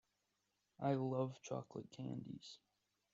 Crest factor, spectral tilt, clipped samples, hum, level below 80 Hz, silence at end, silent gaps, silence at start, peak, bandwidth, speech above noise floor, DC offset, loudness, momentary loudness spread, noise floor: 20 dB; -7.5 dB/octave; under 0.1%; none; -84 dBFS; 0.55 s; none; 0.8 s; -26 dBFS; 7.8 kHz; 42 dB; under 0.1%; -45 LUFS; 15 LU; -86 dBFS